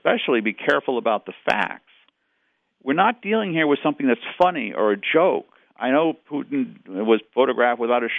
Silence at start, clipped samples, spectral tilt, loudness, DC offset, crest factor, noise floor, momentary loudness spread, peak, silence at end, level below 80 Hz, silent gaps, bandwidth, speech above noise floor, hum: 0.05 s; under 0.1%; -7 dB/octave; -21 LUFS; under 0.1%; 18 dB; -70 dBFS; 8 LU; -4 dBFS; 0 s; -70 dBFS; none; 8 kHz; 49 dB; none